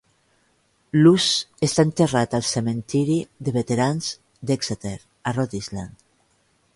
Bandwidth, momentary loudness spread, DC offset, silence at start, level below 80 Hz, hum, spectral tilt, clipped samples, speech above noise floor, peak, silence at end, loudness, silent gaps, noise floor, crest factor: 11.5 kHz; 14 LU; under 0.1%; 0.95 s; -54 dBFS; none; -5 dB/octave; under 0.1%; 43 dB; -4 dBFS; 0.9 s; -22 LUFS; none; -64 dBFS; 18 dB